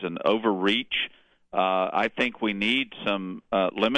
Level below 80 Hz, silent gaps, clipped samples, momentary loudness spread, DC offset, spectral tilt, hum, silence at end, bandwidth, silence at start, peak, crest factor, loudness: -62 dBFS; none; under 0.1%; 5 LU; under 0.1%; -5.5 dB/octave; none; 0 s; 9.8 kHz; 0 s; -8 dBFS; 18 dB; -26 LUFS